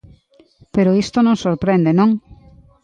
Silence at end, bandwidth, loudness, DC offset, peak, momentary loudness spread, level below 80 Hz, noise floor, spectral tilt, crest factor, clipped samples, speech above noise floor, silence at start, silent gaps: 0.5 s; 9.2 kHz; -16 LUFS; under 0.1%; -4 dBFS; 5 LU; -48 dBFS; -51 dBFS; -7.5 dB/octave; 14 dB; under 0.1%; 37 dB; 0.75 s; none